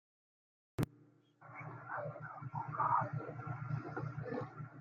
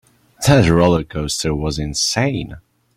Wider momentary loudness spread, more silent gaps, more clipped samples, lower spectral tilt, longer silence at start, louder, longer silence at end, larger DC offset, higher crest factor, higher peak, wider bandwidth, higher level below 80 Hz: first, 15 LU vs 9 LU; neither; neither; first, -8 dB/octave vs -5 dB/octave; first, 0.8 s vs 0.4 s; second, -42 LUFS vs -17 LUFS; second, 0 s vs 0.35 s; neither; first, 22 dB vs 16 dB; second, -20 dBFS vs -2 dBFS; about the same, 15.5 kHz vs 15.5 kHz; second, -70 dBFS vs -36 dBFS